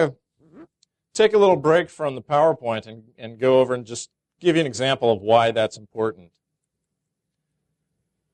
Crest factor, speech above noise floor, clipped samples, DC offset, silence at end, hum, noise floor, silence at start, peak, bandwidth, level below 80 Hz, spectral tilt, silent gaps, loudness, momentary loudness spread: 18 dB; 60 dB; under 0.1%; under 0.1%; 2.2 s; none; -80 dBFS; 0 s; -4 dBFS; 10 kHz; -64 dBFS; -5 dB/octave; none; -20 LUFS; 16 LU